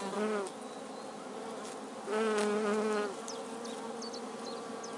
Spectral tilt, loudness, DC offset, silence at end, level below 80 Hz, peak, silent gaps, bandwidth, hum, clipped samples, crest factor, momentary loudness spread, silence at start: -4 dB/octave; -37 LUFS; under 0.1%; 0 s; -86 dBFS; -18 dBFS; none; 11.5 kHz; none; under 0.1%; 20 dB; 12 LU; 0 s